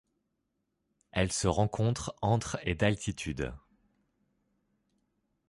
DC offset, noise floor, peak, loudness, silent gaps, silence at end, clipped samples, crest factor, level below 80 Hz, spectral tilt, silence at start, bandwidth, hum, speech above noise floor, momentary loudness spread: under 0.1%; -81 dBFS; -12 dBFS; -32 LUFS; none; 1.9 s; under 0.1%; 22 dB; -50 dBFS; -5 dB/octave; 1.15 s; 11.5 kHz; none; 51 dB; 8 LU